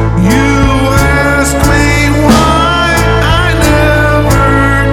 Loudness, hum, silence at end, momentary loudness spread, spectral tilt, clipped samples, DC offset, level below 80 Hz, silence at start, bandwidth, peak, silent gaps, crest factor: -8 LUFS; none; 0 s; 2 LU; -5.5 dB/octave; 0.3%; under 0.1%; -16 dBFS; 0 s; 18.5 kHz; 0 dBFS; none; 8 dB